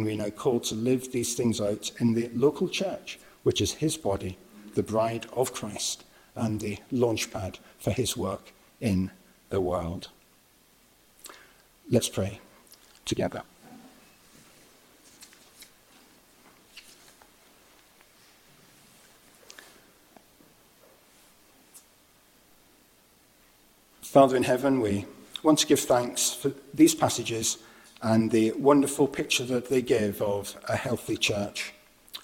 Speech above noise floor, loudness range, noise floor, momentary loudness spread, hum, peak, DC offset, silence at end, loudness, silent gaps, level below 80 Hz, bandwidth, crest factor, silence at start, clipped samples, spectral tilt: 35 dB; 9 LU; -61 dBFS; 18 LU; none; -6 dBFS; under 0.1%; 0.05 s; -27 LUFS; none; -58 dBFS; 17 kHz; 24 dB; 0 s; under 0.1%; -4.5 dB/octave